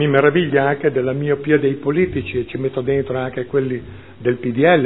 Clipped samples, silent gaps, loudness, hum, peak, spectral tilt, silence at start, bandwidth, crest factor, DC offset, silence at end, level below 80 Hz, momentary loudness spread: under 0.1%; none; -19 LUFS; none; 0 dBFS; -11 dB/octave; 0 s; 4.1 kHz; 18 dB; 0.5%; 0 s; -48 dBFS; 9 LU